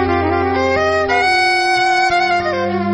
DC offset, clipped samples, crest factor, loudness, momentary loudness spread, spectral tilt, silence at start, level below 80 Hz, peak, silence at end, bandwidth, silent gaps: under 0.1%; under 0.1%; 12 dB; -14 LUFS; 4 LU; -4.5 dB/octave; 0 s; -40 dBFS; -4 dBFS; 0 s; 10 kHz; none